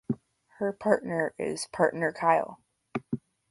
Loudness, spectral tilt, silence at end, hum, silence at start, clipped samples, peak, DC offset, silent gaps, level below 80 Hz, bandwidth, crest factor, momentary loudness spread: -29 LUFS; -5.5 dB/octave; 0.35 s; none; 0.1 s; under 0.1%; -8 dBFS; under 0.1%; none; -68 dBFS; 11.5 kHz; 20 dB; 13 LU